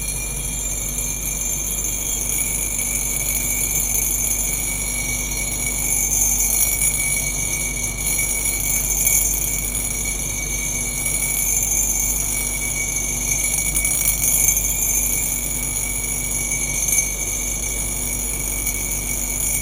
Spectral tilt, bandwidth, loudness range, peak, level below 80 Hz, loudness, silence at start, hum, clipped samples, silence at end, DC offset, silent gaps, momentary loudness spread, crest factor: -1.5 dB/octave; 17 kHz; 3 LU; 0 dBFS; -32 dBFS; -18 LUFS; 0 s; none; under 0.1%; 0 s; under 0.1%; none; 6 LU; 20 dB